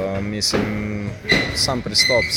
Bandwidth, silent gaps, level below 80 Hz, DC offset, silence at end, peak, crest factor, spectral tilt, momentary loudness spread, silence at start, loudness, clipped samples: 17 kHz; none; -38 dBFS; under 0.1%; 0 s; -2 dBFS; 18 dB; -3 dB/octave; 10 LU; 0 s; -19 LUFS; under 0.1%